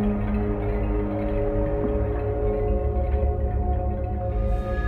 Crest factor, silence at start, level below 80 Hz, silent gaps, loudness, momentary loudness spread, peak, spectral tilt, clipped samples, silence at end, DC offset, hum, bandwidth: 12 dB; 0 s; -26 dBFS; none; -26 LUFS; 2 LU; -12 dBFS; -11 dB/octave; under 0.1%; 0 s; under 0.1%; none; 4.1 kHz